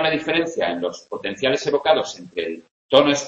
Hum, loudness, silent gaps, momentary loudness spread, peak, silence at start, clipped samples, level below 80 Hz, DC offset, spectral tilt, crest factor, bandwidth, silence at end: none; -21 LUFS; 2.71-2.89 s; 12 LU; 0 dBFS; 0 s; under 0.1%; -58 dBFS; under 0.1%; -3.5 dB/octave; 20 dB; 8.2 kHz; 0 s